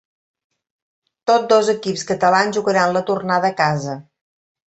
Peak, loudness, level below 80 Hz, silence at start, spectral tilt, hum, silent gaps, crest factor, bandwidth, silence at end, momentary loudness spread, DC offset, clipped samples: -2 dBFS; -17 LUFS; -64 dBFS; 1.25 s; -4.5 dB/octave; none; none; 18 dB; 8.4 kHz; 0.7 s; 10 LU; under 0.1%; under 0.1%